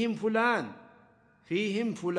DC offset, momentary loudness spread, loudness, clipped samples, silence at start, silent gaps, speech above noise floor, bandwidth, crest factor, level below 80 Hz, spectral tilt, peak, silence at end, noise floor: under 0.1%; 7 LU; -29 LUFS; under 0.1%; 0 s; none; 32 dB; 10.5 kHz; 18 dB; -78 dBFS; -5.5 dB/octave; -12 dBFS; 0 s; -61 dBFS